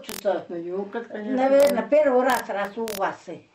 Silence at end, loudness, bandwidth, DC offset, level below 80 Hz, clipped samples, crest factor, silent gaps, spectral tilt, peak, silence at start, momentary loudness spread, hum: 0.15 s; -23 LUFS; 16 kHz; under 0.1%; -64 dBFS; under 0.1%; 16 dB; none; -4.5 dB/octave; -8 dBFS; 0 s; 13 LU; none